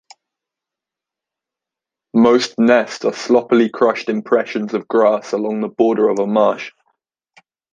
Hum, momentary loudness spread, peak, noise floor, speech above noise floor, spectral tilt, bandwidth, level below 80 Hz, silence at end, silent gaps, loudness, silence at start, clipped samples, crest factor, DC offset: none; 8 LU; -2 dBFS; -86 dBFS; 71 dB; -5.5 dB/octave; 9 kHz; -64 dBFS; 1.05 s; none; -16 LUFS; 2.15 s; under 0.1%; 16 dB; under 0.1%